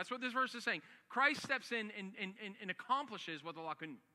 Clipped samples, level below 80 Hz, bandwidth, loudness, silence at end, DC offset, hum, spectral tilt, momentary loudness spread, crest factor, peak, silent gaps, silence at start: under 0.1%; under -90 dBFS; 15 kHz; -40 LUFS; 0.15 s; under 0.1%; none; -3.5 dB/octave; 12 LU; 22 dB; -18 dBFS; none; 0 s